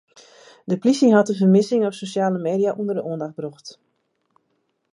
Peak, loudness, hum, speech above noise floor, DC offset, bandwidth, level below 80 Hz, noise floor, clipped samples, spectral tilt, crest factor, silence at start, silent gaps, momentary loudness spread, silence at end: -2 dBFS; -20 LUFS; none; 51 dB; under 0.1%; 11 kHz; -74 dBFS; -71 dBFS; under 0.1%; -6.5 dB/octave; 20 dB; 0.65 s; none; 17 LU; 1.2 s